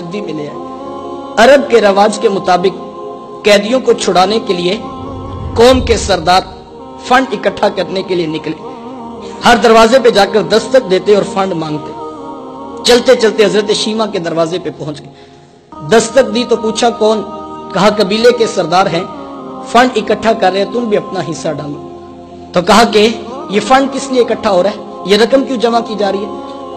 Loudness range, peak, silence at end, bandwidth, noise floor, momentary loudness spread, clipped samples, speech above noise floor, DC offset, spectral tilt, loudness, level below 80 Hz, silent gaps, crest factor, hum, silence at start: 4 LU; 0 dBFS; 0 s; 15 kHz; -37 dBFS; 18 LU; under 0.1%; 27 dB; under 0.1%; -4 dB/octave; -11 LUFS; -36 dBFS; none; 12 dB; none; 0 s